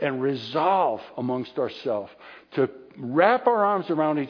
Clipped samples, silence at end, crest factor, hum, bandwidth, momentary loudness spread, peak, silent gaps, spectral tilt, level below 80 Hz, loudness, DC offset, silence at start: under 0.1%; 0 s; 20 dB; none; 5.4 kHz; 11 LU; -6 dBFS; none; -8 dB/octave; -74 dBFS; -24 LUFS; under 0.1%; 0 s